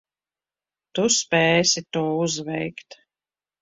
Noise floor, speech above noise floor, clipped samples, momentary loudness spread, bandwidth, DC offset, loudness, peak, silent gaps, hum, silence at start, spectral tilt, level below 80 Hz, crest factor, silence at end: under -90 dBFS; over 68 dB; under 0.1%; 14 LU; 8 kHz; under 0.1%; -21 LUFS; -6 dBFS; none; 50 Hz at -55 dBFS; 0.95 s; -3 dB/octave; -64 dBFS; 18 dB; 0.7 s